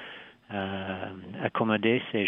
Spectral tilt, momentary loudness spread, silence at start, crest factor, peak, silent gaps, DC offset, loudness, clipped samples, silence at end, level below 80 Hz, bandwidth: -8.5 dB/octave; 15 LU; 0 s; 20 dB; -10 dBFS; none; under 0.1%; -30 LUFS; under 0.1%; 0 s; -72 dBFS; 3.9 kHz